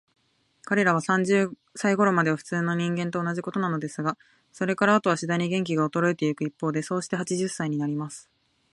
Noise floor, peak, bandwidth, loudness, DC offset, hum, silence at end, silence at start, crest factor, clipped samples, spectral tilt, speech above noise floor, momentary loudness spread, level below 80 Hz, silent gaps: -60 dBFS; -6 dBFS; 11.5 kHz; -25 LUFS; under 0.1%; none; 0.5 s; 0.65 s; 20 dB; under 0.1%; -6 dB/octave; 35 dB; 9 LU; -72 dBFS; none